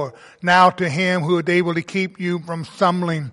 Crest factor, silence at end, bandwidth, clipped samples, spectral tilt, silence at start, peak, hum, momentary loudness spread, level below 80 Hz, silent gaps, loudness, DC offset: 18 dB; 0 s; 11.5 kHz; under 0.1%; -6 dB/octave; 0 s; -2 dBFS; none; 12 LU; -62 dBFS; none; -19 LUFS; under 0.1%